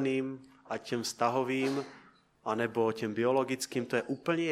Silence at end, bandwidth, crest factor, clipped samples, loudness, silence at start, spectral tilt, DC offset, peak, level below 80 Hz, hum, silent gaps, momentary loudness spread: 0 s; 15.5 kHz; 18 dB; under 0.1%; -32 LUFS; 0 s; -5 dB/octave; under 0.1%; -14 dBFS; -76 dBFS; none; none; 11 LU